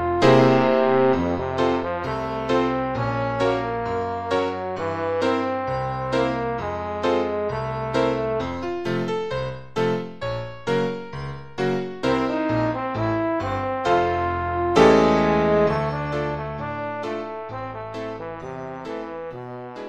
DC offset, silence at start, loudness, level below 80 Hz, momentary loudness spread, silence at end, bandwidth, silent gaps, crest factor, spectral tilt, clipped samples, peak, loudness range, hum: under 0.1%; 0 s; -23 LUFS; -46 dBFS; 14 LU; 0 s; 10.5 kHz; none; 20 dB; -7 dB/octave; under 0.1%; -4 dBFS; 7 LU; none